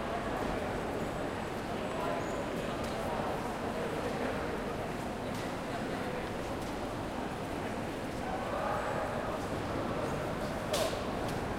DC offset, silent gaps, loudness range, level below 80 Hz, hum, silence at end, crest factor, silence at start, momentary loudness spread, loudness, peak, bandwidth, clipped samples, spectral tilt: under 0.1%; none; 2 LU; -50 dBFS; none; 0 s; 16 dB; 0 s; 4 LU; -36 LUFS; -18 dBFS; 16 kHz; under 0.1%; -5 dB/octave